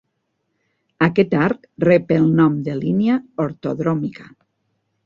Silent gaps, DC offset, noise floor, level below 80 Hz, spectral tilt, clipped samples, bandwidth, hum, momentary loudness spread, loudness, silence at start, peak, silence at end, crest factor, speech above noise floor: none; under 0.1%; -72 dBFS; -56 dBFS; -9.5 dB/octave; under 0.1%; 7 kHz; none; 9 LU; -18 LUFS; 1 s; -2 dBFS; 0.8 s; 18 dB; 54 dB